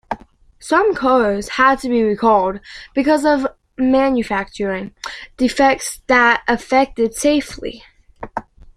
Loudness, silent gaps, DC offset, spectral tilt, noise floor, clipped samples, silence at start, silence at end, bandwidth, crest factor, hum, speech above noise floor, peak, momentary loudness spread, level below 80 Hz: -16 LUFS; none; under 0.1%; -4 dB/octave; -44 dBFS; under 0.1%; 0.1 s; 0.35 s; 15 kHz; 16 dB; none; 28 dB; -2 dBFS; 16 LU; -44 dBFS